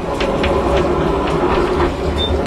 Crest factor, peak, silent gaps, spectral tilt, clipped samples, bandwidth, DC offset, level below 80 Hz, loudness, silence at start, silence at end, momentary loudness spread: 12 dB; -4 dBFS; none; -6.5 dB/octave; under 0.1%; 13 kHz; under 0.1%; -24 dBFS; -16 LUFS; 0 s; 0 s; 2 LU